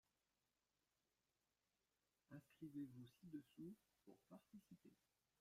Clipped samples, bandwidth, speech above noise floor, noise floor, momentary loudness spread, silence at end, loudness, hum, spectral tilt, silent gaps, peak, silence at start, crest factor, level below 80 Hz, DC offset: under 0.1%; 15.5 kHz; over 29 dB; under -90 dBFS; 12 LU; 0.45 s; -61 LUFS; none; -7.5 dB/octave; none; -44 dBFS; 2.3 s; 20 dB; under -90 dBFS; under 0.1%